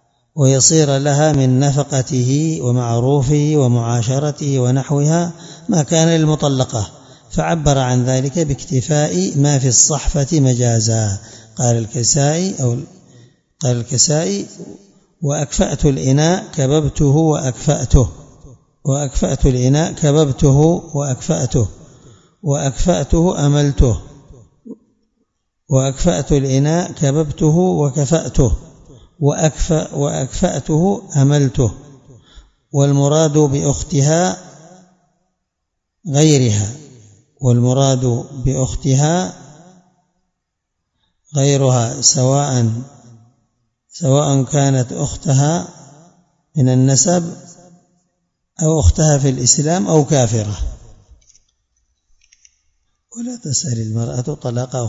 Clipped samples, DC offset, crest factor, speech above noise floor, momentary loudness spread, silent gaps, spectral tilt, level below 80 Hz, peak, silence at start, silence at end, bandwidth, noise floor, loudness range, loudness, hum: under 0.1%; under 0.1%; 16 dB; 60 dB; 10 LU; none; -5.5 dB/octave; -30 dBFS; 0 dBFS; 0.35 s; 0 s; 8 kHz; -75 dBFS; 4 LU; -15 LUFS; none